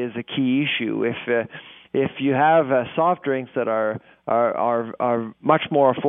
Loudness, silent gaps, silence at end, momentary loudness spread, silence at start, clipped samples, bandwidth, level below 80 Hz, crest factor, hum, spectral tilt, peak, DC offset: -21 LUFS; none; 0 s; 8 LU; 0 s; under 0.1%; 3.8 kHz; -68 dBFS; 20 dB; none; -10.5 dB/octave; -2 dBFS; under 0.1%